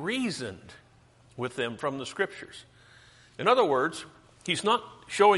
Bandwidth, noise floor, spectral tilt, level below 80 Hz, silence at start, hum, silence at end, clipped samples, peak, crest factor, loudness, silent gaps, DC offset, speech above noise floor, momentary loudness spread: 11.5 kHz; -59 dBFS; -4 dB/octave; -68 dBFS; 0 s; none; 0 s; under 0.1%; -8 dBFS; 22 dB; -28 LUFS; none; under 0.1%; 31 dB; 24 LU